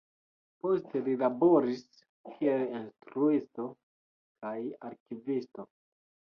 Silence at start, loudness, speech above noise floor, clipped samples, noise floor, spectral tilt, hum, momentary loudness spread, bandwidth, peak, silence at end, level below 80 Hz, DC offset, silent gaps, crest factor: 0.65 s; -31 LUFS; over 59 dB; under 0.1%; under -90 dBFS; -8.5 dB/octave; none; 19 LU; 6.6 kHz; -14 dBFS; 0.75 s; -80 dBFS; under 0.1%; 2.09-2.24 s, 3.83-4.35 s, 5.00-5.06 s; 18 dB